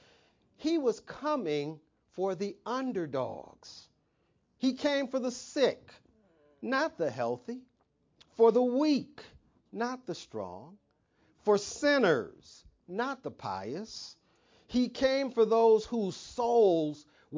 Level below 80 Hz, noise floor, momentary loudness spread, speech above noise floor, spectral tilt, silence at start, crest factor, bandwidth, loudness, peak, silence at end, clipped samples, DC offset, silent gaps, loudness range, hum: -68 dBFS; -74 dBFS; 20 LU; 43 dB; -5 dB/octave; 0.6 s; 20 dB; 7.6 kHz; -31 LUFS; -12 dBFS; 0 s; under 0.1%; under 0.1%; none; 5 LU; none